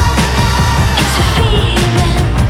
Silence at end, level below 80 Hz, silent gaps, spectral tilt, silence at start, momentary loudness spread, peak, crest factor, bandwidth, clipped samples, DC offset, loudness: 0 s; -16 dBFS; none; -5 dB/octave; 0 s; 1 LU; -2 dBFS; 10 dB; 16 kHz; under 0.1%; under 0.1%; -12 LUFS